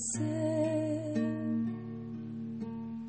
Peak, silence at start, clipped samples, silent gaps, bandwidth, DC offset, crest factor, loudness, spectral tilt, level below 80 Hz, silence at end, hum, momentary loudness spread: -20 dBFS; 0 s; under 0.1%; none; 8.8 kHz; under 0.1%; 14 dB; -35 LUFS; -6 dB/octave; -68 dBFS; 0 s; none; 10 LU